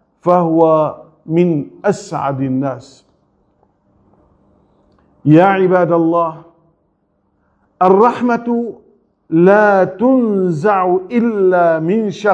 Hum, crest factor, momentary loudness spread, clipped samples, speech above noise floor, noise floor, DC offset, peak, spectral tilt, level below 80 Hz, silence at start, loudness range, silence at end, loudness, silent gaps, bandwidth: none; 14 dB; 10 LU; under 0.1%; 49 dB; -62 dBFS; under 0.1%; 0 dBFS; -8 dB/octave; -60 dBFS; 0.25 s; 8 LU; 0 s; -13 LUFS; none; 8.8 kHz